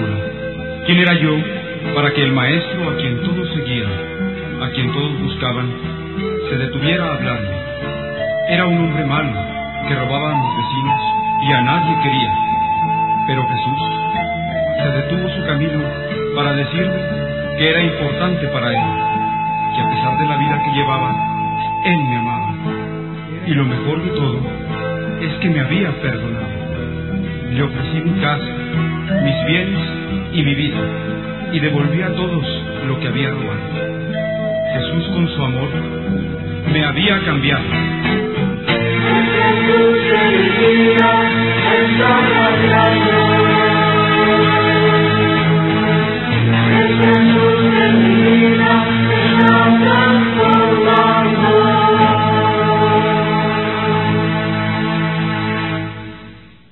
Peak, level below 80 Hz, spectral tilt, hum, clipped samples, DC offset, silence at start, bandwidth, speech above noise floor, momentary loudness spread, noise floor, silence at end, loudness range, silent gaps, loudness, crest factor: 0 dBFS; -38 dBFS; -10 dB/octave; none; under 0.1%; 0.4%; 0 s; 4.3 kHz; 23 dB; 11 LU; -39 dBFS; 0.3 s; 8 LU; none; -15 LUFS; 16 dB